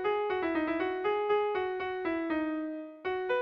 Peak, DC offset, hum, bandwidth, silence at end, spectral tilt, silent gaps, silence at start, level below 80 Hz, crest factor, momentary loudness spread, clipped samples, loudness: -18 dBFS; under 0.1%; none; 5.8 kHz; 0 s; -6.5 dB/octave; none; 0 s; -64 dBFS; 12 dB; 7 LU; under 0.1%; -32 LUFS